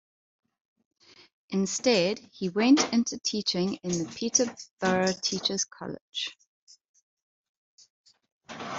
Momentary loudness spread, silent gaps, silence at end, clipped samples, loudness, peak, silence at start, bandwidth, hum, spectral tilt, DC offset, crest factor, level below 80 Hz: 12 LU; 4.71-4.77 s, 6.01-6.12 s, 6.47-6.67 s, 6.88-6.94 s, 7.02-7.17 s, 7.23-7.78 s, 7.90-8.04 s, 8.32-8.41 s; 0 s; under 0.1%; -27 LUFS; -8 dBFS; 1.5 s; 8.2 kHz; none; -3.5 dB/octave; under 0.1%; 20 dB; -68 dBFS